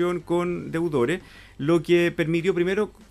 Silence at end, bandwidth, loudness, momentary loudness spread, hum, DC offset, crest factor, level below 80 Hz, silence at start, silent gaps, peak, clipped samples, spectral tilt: 0.2 s; 13 kHz; -24 LUFS; 7 LU; none; under 0.1%; 14 dB; -52 dBFS; 0 s; none; -10 dBFS; under 0.1%; -7 dB/octave